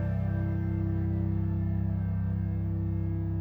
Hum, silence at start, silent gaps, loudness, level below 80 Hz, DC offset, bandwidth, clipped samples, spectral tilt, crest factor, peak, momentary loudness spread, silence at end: none; 0 s; none; -31 LUFS; -40 dBFS; under 0.1%; 2.8 kHz; under 0.1%; -12 dB/octave; 10 dB; -20 dBFS; 1 LU; 0 s